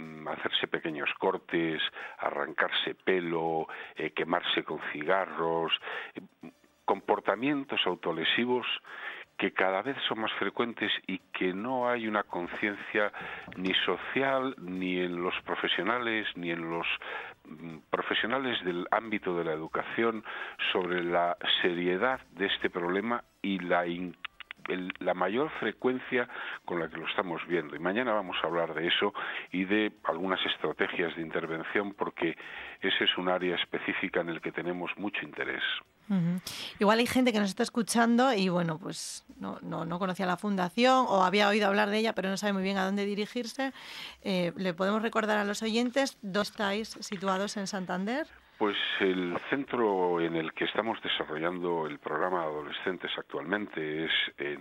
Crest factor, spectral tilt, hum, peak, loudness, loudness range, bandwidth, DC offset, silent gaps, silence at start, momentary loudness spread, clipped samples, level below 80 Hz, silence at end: 22 dB; -4.5 dB/octave; none; -8 dBFS; -31 LUFS; 4 LU; 16 kHz; under 0.1%; none; 0 s; 9 LU; under 0.1%; -70 dBFS; 0 s